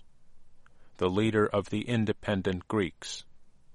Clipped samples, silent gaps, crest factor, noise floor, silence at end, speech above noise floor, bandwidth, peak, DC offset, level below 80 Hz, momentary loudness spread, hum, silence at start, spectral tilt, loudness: under 0.1%; none; 20 dB; -50 dBFS; 0 s; 21 dB; 11.5 kHz; -12 dBFS; under 0.1%; -56 dBFS; 11 LU; none; 0 s; -6 dB/octave; -30 LUFS